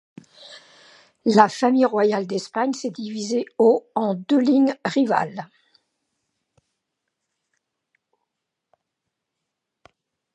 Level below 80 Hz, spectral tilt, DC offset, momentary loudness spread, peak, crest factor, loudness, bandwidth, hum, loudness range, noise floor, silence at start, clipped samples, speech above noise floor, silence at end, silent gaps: -76 dBFS; -5.5 dB/octave; under 0.1%; 11 LU; 0 dBFS; 24 dB; -21 LUFS; 11 kHz; none; 8 LU; -81 dBFS; 0.45 s; under 0.1%; 61 dB; 4.9 s; none